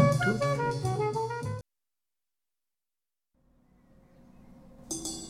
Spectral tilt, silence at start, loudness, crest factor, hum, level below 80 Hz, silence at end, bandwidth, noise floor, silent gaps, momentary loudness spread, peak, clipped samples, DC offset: -5.5 dB/octave; 0 s; -31 LUFS; 22 dB; none; -58 dBFS; 0 s; 14.5 kHz; under -90 dBFS; none; 12 LU; -10 dBFS; under 0.1%; under 0.1%